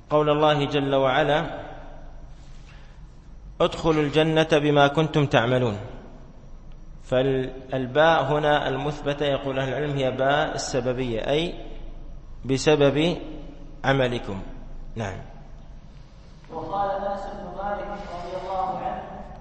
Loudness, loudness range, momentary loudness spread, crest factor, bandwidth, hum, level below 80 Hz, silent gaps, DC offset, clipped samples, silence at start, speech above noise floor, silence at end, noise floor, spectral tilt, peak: -23 LUFS; 9 LU; 20 LU; 20 dB; 8.8 kHz; none; -40 dBFS; none; under 0.1%; under 0.1%; 0.1 s; 22 dB; 0 s; -44 dBFS; -5.5 dB/octave; -4 dBFS